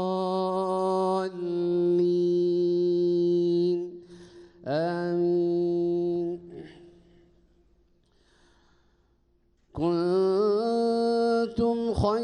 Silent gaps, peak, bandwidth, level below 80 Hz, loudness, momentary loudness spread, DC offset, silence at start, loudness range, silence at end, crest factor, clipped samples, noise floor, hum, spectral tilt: none; -14 dBFS; 9.8 kHz; -54 dBFS; -26 LUFS; 8 LU; under 0.1%; 0 s; 9 LU; 0 s; 14 dB; under 0.1%; -66 dBFS; none; -8 dB/octave